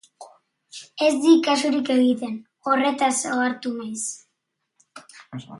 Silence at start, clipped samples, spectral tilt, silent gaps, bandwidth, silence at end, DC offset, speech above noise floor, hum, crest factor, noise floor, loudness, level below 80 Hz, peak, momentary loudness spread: 0.2 s; under 0.1%; -3 dB/octave; none; 11.5 kHz; 0 s; under 0.1%; 56 dB; none; 18 dB; -77 dBFS; -21 LUFS; -74 dBFS; -4 dBFS; 22 LU